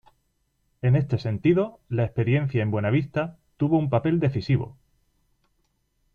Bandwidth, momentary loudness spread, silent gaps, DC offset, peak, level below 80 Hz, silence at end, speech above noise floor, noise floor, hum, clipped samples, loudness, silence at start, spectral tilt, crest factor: 5 kHz; 6 LU; none; under 0.1%; -8 dBFS; -54 dBFS; 1.45 s; 48 dB; -71 dBFS; none; under 0.1%; -24 LUFS; 0.85 s; -9.5 dB/octave; 18 dB